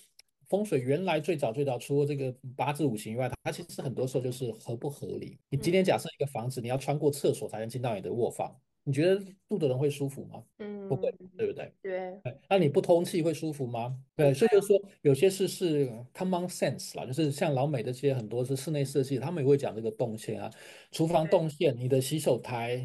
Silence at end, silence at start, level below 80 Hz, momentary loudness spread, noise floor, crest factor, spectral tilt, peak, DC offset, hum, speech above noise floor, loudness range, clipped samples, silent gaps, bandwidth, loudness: 0 s; 0.5 s; -68 dBFS; 11 LU; -62 dBFS; 18 dB; -6 dB/octave; -10 dBFS; under 0.1%; none; 32 dB; 5 LU; under 0.1%; none; 12.5 kHz; -30 LUFS